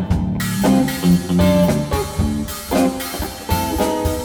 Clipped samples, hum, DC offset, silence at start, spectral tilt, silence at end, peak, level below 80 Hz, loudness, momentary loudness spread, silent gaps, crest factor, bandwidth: under 0.1%; none; under 0.1%; 0 s; -6 dB/octave; 0 s; -4 dBFS; -32 dBFS; -18 LUFS; 7 LU; none; 14 dB; over 20 kHz